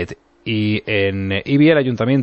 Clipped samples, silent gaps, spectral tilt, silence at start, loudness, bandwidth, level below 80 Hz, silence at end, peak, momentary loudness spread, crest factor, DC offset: under 0.1%; none; -8 dB/octave; 0 s; -17 LUFS; 6.6 kHz; -52 dBFS; 0 s; -2 dBFS; 11 LU; 14 dB; under 0.1%